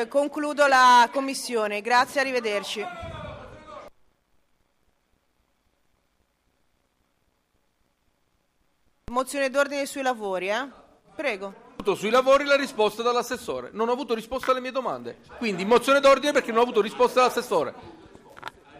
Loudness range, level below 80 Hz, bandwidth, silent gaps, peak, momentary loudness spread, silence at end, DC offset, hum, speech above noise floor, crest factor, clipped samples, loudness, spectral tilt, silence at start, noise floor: 11 LU; -58 dBFS; 15.5 kHz; none; -8 dBFS; 19 LU; 0 s; under 0.1%; none; 47 dB; 16 dB; under 0.1%; -23 LUFS; -3 dB/octave; 0 s; -71 dBFS